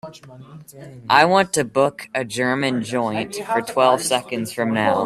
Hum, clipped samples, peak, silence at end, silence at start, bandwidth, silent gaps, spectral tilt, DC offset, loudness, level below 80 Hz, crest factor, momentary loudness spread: none; under 0.1%; 0 dBFS; 0 s; 0.05 s; 14.5 kHz; none; -4 dB/octave; under 0.1%; -19 LUFS; -62 dBFS; 20 dB; 11 LU